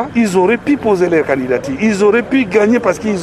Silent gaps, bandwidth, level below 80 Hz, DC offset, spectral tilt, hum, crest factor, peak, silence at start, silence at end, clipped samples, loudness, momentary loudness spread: none; 13.5 kHz; -46 dBFS; under 0.1%; -6 dB/octave; none; 12 dB; 0 dBFS; 0 s; 0 s; under 0.1%; -13 LUFS; 4 LU